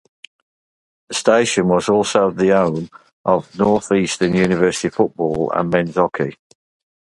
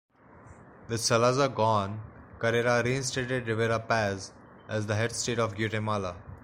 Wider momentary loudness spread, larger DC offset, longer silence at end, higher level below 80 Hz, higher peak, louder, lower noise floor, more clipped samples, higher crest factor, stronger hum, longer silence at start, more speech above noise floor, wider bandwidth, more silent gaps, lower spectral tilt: second, 8 LU vs 12 LU; neither; first, 0.7 s vs 0.05 s; first, -50 dBFS vs -58 dBFS; first, 0 dBFS vs -10 dBFS; first, -17 LUFS vs -28 LUFS; first, under -90 dBFS vs -52 dBFS; neither; about the same, 18 dB vs 20 dB; neither; first, 1.1 s vs 0.35 s; first, over 73 dB vs 25 dB; second, 11.5 kHz vs 16 kHz; first, 3.13-3.24 s vs none; about the same, -5 dB/octave vs -4.5 dB/octave